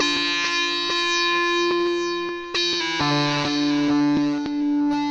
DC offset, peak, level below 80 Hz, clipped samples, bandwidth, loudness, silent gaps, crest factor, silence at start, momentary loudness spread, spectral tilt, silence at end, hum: under 0.1%; -8 dBFS; -56 dBFS; under 0.1%; 8.4 kHz; -21 LUFS; none; 14 dB; 0 s; 5 LU; -3.5 dB/octave; 0 s; none